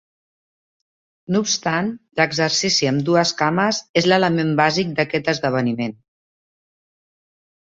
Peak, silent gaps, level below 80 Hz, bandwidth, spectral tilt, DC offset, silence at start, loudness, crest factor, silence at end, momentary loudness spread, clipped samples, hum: -2 dBFS; 3.89-3.94 s; -60 dBFS; 8 kHz; -4 dB/octave; under 0.1%; 1.3 s; -19 LUFS; 20 dB; 1.8 s; 6 LU; under 0.1%; none